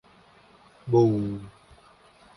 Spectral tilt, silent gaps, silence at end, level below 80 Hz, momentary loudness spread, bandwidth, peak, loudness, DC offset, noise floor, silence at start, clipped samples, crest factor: -9.5 dB/octave; none; 0.9 s; -58 dBFS; 23 LU; 10.5 kHz; -8 dBFS; -24 LUFS; under 0.1%; -56 dBFS; 0.85 s; under 0.1%; 20 dB